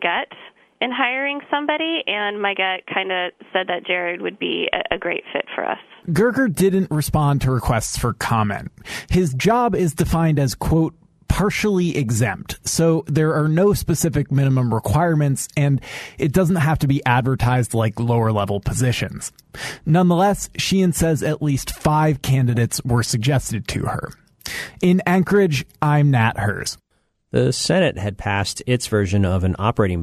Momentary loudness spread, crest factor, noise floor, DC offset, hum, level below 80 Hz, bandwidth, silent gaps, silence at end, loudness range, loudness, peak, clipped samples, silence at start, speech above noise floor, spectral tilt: 8 LU; 18 dB; -67 dBFS; under 0.1%; none; -38 dBFS; 13.5 kHz; none; 0 s; 3 LU; -20 LUFS; -2 dBFS; under 0.1%; 0 s; 48 dB; -5.5 dB/octave